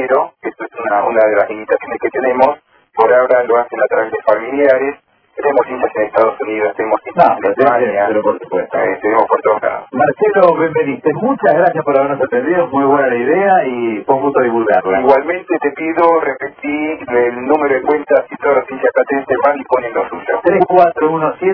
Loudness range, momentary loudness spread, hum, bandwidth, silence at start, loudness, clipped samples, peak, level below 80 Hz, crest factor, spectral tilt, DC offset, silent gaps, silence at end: 2 LU; 7 LU; none; 5.4 kHz; 0 s; -14 LUFS; 0.2%; 0 dBFS; -56 dBFS; 14 dB; -9.5 dB/octave; under 0.1%; none; 0 s